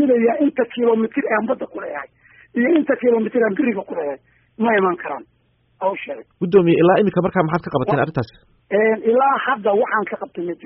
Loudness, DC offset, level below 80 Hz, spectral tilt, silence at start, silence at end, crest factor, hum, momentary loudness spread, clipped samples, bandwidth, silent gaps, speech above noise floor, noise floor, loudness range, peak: -19 LUFS; under 0.1%; -58 dBFS; -5.5 dB/octave; 0 s; 0.1 s; 16 dB; none; 13 LU; under 0.1%; 5 kHz; none; 28 dB; -47 dBFS; 3 LU; -2 dBFS